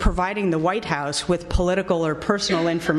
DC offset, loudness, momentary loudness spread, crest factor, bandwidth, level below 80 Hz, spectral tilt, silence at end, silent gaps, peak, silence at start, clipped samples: under 0.1%; -22 LUFS; 3 LU; 16 dB; 12 kHz; -32 dBFS; -5 dB/octave; 0 s; none; -4 dBFS; 0 s; under 0.1%